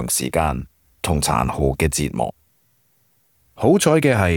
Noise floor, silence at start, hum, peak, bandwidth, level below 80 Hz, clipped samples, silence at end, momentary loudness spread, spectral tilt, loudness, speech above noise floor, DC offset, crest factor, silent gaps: -62 dBFS; 0 s; none; -4 dBFS; over 20 kHz; -36 dBFS; under 0.1%; 0 s; 12 LU; -5 dB/octave; -19 LUFS; 44 dB; under 0.1%; 16 dB; none